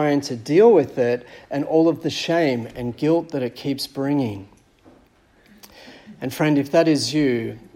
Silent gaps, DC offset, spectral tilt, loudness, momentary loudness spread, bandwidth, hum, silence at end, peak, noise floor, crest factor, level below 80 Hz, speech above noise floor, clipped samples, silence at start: none; under 0.1%; -6 dB/octave; -20 LUFS; 13 LU; 16.5 kHz; none; 0.2 s; -4 dBFS; -56 dBFS; 16 dB; -58 dBFS; 36 dB; under 0.1%; 0 s